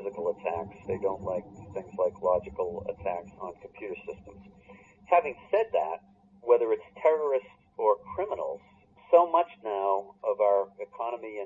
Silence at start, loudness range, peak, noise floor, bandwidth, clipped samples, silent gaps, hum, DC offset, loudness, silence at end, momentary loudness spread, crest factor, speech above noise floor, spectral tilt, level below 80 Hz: 0 s; 6 LU; -8 dBFS; -58 dBFS; 7.4 kHz; under 0.1%; none; none; under 0.1%; -29 LUFS; 0 s; 16 LU; 22 dB; 29 dB; -7.5 dB/octave; -64 dBFS